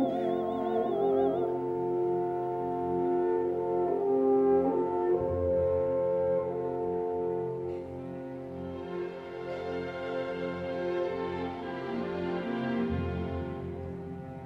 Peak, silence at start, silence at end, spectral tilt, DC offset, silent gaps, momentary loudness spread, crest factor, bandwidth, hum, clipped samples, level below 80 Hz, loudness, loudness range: -16 dBFS; 0 s; 0 s; -9 dB/octave; under 0.1%; none; 11 LU; 14 dB; 6 kHz; none; under 0.1%; -54 dBFS; -31 LUFS; 8 LU